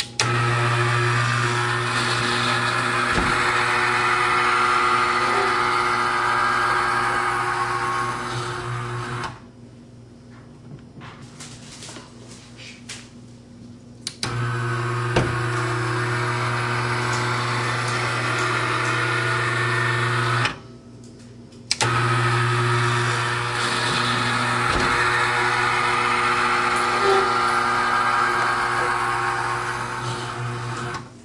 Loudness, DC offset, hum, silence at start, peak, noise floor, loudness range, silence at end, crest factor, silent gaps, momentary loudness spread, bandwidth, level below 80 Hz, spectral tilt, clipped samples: -21 LUFS; under 0.1%; none; 0 s; -2 dBFS; -44 dBFS; 15 LU; 0 s; 20 dB; none; 13 LU; 11.5 kHz; -48 dBFS; -4 dB/octave; under 0.1%